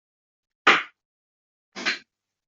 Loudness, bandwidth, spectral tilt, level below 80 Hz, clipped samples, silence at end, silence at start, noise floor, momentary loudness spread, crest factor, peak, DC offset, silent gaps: -23 LUFS; 7.8 kHz; -1.5 dB/octave; -76 dBFS; under 0.1%; 0.5 s; 0.65 s; -55 dBFS; 20 LU; 26 dB; -2 dBFS; under 0.1%; 1.05-1.72 s